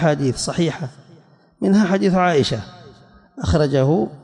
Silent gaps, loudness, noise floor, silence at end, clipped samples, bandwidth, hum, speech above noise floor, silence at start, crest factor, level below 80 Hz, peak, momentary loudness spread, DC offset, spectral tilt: none; -18 LUFS; -50 dBFS; 0.05 s; under 0.1%; 11.5 kHz; none; 32 dB; 0 s; 14 dB; -42 dBFS; -4 dBFS; 12 LU; under 0.1%; -6 dB/octave